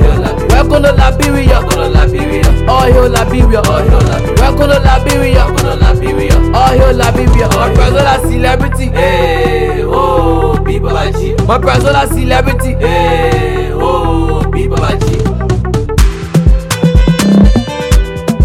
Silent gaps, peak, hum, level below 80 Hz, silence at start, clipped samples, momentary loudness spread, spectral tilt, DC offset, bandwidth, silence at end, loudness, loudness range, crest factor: none; 0 dBFS; none; -12 dBFS; 0 s; 0.2%; 5 LU; -6 dB/octave; under 0.1%; 15.5 kHz; 0 s; -10 LUFS; 3 LU; 8 dB